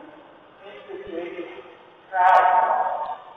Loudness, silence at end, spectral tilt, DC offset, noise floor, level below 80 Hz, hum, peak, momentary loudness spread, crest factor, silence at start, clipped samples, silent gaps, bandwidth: -20 LUFS; 0.05 s; -4.5 dB/octave; under 0.1%; -48 dBFS; -66 dBFS; none; -4 dBFS; 23 LU; 18 dB; 0 s; under 0.1%; none; 7.2 kHz